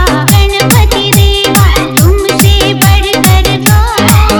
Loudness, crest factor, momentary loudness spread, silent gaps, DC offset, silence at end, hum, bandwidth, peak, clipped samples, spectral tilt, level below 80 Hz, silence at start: -7 LUFS; 6 dB; 1 LU; none; under 0.1%; 0 s; none; over 20 kHz; 0 dBFS; 3%; -4.5 dB/octave; -12 dBFS; 0 s